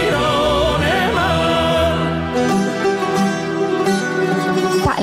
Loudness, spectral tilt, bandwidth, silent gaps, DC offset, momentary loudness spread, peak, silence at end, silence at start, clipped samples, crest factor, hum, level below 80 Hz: -17 LUFS; -5 dB/octave; 16 kHz; none; under 0.1%; 3 LU; -2 dBFS; 0 s; 0 s; under 0.1%; 14 dB; none; -34 dBFS